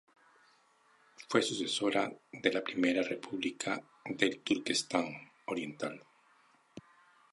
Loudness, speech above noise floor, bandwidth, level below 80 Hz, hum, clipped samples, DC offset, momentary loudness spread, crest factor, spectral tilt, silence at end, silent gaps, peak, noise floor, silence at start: -34 LUFS; 34 dB; 11.5 kHz; -76 dBFS; none; under 0.1%; under 0.1%; 19 LU; 24 dB; -3 dB/octave; 0.5 s; none; -12 dBFS; -68 dBFS; 1.2 s